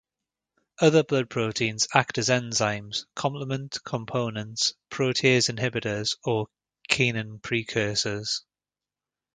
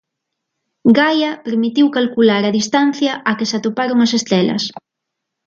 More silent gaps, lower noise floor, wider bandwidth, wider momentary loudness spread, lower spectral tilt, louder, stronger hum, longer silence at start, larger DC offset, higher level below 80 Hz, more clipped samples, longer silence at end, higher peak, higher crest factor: neither; first, under -90 dBFS vs -78 dBFS; first, 9.6 kHz vs 7.6 kHz; first, 10 LU vs 6 LU; about the same, -3.5 dB/octave vs -4.5 dB/octave; second, -26 LUFS vs -15 LUFS; neither; about the same, 0.8 s vs 0.85 s; neither; about the same, -62 dBFS vs -62 dBFS; neither; first, 0.95 s vs 0.65 s; about the same, 0 dBFS vs 0 dBFS; first, 26 dB vs 16 dB